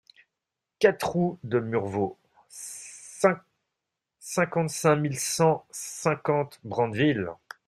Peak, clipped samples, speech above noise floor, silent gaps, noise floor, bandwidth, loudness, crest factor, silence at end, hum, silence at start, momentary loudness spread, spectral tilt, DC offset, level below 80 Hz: -6 dBFS; under 0.1%; 60 dB; none; -86 dBFS; 15.5 kHz; -26 LUFS; 22 dB; 0.3 s; none; 0.8 s; 15 LU; -5 dB/octave; under 0.1%; -64 dBFS